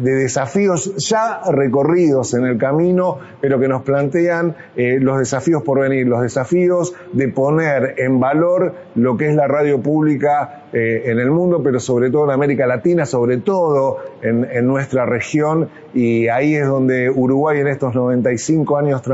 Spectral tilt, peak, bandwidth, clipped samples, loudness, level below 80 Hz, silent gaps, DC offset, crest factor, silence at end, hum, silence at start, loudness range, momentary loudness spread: -6.5 dB/octave; -2 dBFS; 8 kHz; under 0.1%; -16 LUFS; -58 dBFS; none; under 0.1%; 14 dB; 0 s; none; 0 s; 1 LU; 4 LU